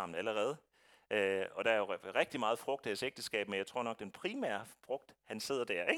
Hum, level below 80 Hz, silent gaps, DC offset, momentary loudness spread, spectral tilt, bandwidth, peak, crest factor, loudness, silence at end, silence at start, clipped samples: none; -82 dBFS; none; under 0.1%; 10 LU; -3.5 dB/octave; 18 kHz; -16 dBFS; 22 dB; -38 LUFS; 0 s; 0 s; under 0.1%